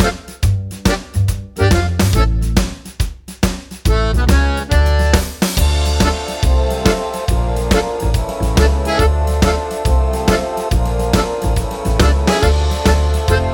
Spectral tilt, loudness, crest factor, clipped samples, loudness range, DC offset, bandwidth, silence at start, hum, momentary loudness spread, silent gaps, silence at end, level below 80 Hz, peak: -5.5 dB/octave; -16 LUFS; 14 dB; under 0.1%; 2 LU; under 0.1%; 18 kHz; 0 s; none; 5 LU; none; 0 s; -18 dBFS; 0 dBFS